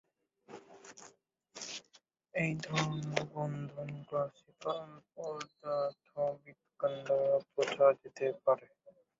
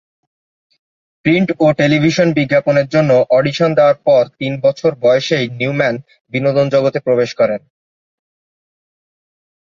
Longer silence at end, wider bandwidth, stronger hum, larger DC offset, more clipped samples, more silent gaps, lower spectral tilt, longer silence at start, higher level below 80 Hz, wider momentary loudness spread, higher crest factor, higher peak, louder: second, 0.3 s vs 2.15 s; about the same, 7.6 kHz vs 7.4 kHz; neither; neither; neither; second, none vs 6.21-6.25 s; second, -4.5 dB/octave vs -6.5 dB/octave; second, 0.5 s vs 1.25 s; second, -76 dBFS vs -56 dBFS; first, 22 LU vs 6 LU; first, 26 dB vs 14 dB; second, -12 dBFS vs 0 dBFS; second, -36 LUFS vs -14 LUFS